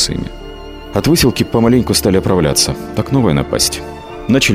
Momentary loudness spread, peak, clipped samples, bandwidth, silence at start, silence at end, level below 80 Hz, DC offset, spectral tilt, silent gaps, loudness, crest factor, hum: 16 LU; 0 dBFS; under 0.1%; 16.5 kHz; 0 s; 0 s; -32 dBFS; under 0.1%; -4.5 dB/octave; none; -13 LUFS; 14 dB; none